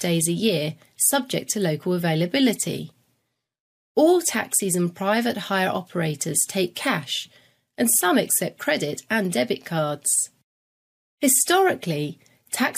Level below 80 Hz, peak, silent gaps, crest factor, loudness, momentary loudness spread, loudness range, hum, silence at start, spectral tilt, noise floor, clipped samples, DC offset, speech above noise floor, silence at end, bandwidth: -68 dBFS; -6 dBFS; 3.60-3.95 s, 10.44-11.18 s; 18 dB; -22 LUFS; 9 LU; 2 LU; none; 0 s; -3.5 dB/octave; -74 dBFS; under 0.1%; under 0.1%; 51 dB; 0 s; 15.5 kHz